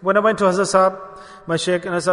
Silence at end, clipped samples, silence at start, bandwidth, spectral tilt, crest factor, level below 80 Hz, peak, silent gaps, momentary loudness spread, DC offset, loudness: 0 s; under 0.1%; 0 s; 11 kHz; -4.5 dB/octave; 16 dB; -58 dBFS; -2 dBFS; none; 20 LU; under 0.1%; -18 LUFS